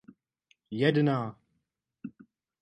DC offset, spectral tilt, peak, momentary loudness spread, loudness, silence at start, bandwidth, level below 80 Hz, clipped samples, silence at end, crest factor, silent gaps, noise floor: under 0.1%; -8.5 dB/octave; -12 dBFS; 22 LU; -28 LUFS; 0.7 s; 9.2 kHz; -74 dBFS; under 0.1%; 0.55 s; 22 dB; none; -81 dBFS